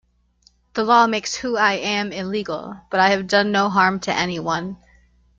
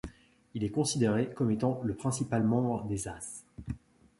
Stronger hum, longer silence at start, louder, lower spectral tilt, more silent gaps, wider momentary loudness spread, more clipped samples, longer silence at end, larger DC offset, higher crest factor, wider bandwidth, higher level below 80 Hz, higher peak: first, 60 Hz at -45 dBFS vs none; first, 0.75 s vs 0.05 s; first, -20 LUFS vs -31 LUFS; second, -4 dB/octave vs -6 dB/octave; neither; second, 10 LU vs 15 LU; neither; first, 0.65 s vs 0.4 s; neither; about the same, 18 dB vs 16 dB; second, 7.8 kHz vs 11.5 kHz; about the same, -56 dBFS vs -54 dBFS; first, -2 dBFS vs -16 dBFS